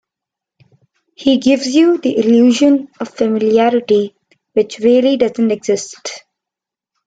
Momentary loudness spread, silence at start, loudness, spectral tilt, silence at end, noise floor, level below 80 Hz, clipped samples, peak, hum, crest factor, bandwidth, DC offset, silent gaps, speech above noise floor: 14 LU; 1.2 s; -13 LUFS; -4.5 dB/octave; 0.9 s; -85 dBFS; -58 dBFS; under 0.1%; -2 dBFS; none; 14 dB; 9.2 kHz; under 0.1%; none; 72 dB